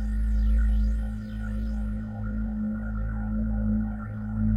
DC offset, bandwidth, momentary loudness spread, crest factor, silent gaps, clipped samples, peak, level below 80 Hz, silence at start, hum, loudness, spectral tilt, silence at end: under 0.1%; 3.3 kHz; 8 LU; 12 dB; none; under 0.1%; -14 dBFS; -28 dBFS; 0 s; none; -30 LUFS; -9.5 dB/octave; 0 s